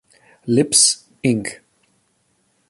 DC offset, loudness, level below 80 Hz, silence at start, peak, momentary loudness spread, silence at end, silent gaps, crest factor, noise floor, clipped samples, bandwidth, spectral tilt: under 0.1%; -16 LUFS; -58 dBFS; 0.45 s; 0 dBFS; 16 LU; 1.15 s; none; 20 dB; -65 dBFS; under 0.1%; 12 kHz; -3 dB/octave